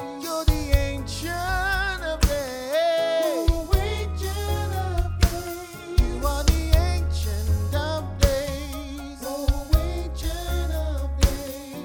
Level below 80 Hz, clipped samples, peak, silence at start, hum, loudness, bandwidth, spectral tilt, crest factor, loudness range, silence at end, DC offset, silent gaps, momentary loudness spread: -26 dBFS; under 0.1%; -4 dBFS; 0 s; none; -25 LUFS; over 20 kHz; -5 dB/octave; 20 dB; 2 LU; 0 s; under 0.1%; none; 8 LU